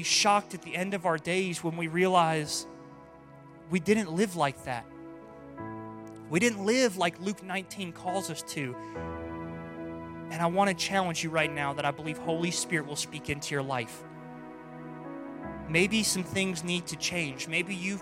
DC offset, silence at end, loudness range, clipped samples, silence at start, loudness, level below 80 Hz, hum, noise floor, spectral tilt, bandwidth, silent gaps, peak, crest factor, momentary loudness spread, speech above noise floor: under 0.1%; 0 s; 4 LU; under 0.1%; 0 s; -30 LUFS; -60 dBFS; none; -51 dBFS; -3.5 dB/octave; 16 kHz; none; -10 dBFS; 22 dB; 18 LU; 21 dB